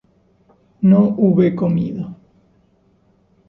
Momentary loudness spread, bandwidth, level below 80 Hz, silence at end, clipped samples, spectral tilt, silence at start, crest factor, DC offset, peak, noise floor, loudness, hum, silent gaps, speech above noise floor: 14 LU; 3.8 kHz; -54 dBFS; 1.35 s; under 0.1%; -12 dB/octave; 0.8 s; 16 dB; under 0.1%; -4 dBFS; -57 dBFS; -16 LUFS; none; none; 43 dB